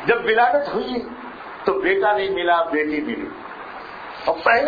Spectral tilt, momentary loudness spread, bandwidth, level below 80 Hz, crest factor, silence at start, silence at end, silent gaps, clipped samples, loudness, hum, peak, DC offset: -6.5 dB/octave; 17 LU; 5 kHz; -54 dBFS; 18 dB; 0 s; 0 s; none; under 0.1%; -20 LUFS; none; -4 dBFS; under 0.1%